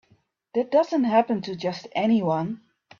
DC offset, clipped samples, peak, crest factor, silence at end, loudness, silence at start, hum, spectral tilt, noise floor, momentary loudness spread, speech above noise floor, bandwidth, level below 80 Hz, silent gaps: under 0.1%; under 0.1%; -8 dBFS; 18 dB; 0.45 s; -24 LUFS; 0.55 s; none; -7 dB/octave; -64 dBFS; 9 LU; 41 dB; 7.2 kHz; -68 dBFS; none